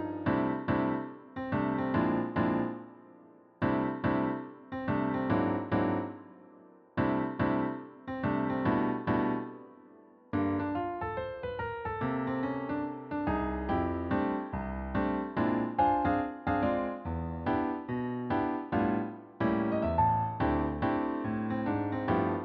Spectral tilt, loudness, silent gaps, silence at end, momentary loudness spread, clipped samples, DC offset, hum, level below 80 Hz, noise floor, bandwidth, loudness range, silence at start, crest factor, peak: -7 dB/octave; -32 LUFS; none; 0 s; 8 LU; under 0.1%; under 0.1%; none; -50 dBFS; -57 dBFS; 5.2 kHz; 3 LU; 0 s; 16 dB; -14 dBFS